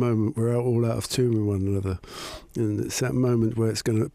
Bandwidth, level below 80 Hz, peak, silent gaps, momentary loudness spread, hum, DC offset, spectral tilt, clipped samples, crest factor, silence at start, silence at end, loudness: 15.5 kHz; -50 dBFS; -12 dBFS; none; 9 LU; none; under 0.1%; -6.5 dB/octave; under 0.1%; 12 dB; 0 s; 0.05 s; -25 LUFS